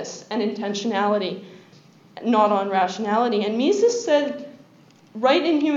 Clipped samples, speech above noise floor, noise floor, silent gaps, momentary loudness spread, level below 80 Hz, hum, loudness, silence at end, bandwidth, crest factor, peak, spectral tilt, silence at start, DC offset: under 0.1%; 31 dB; -52 dBFS; none; 11 LU; -84 dBFS; none; -21 LUFS; 0 s; 7.8 kHz; 16 dB; -6 dBFS; -4.5 dB/octave; 0 s; under 0.1%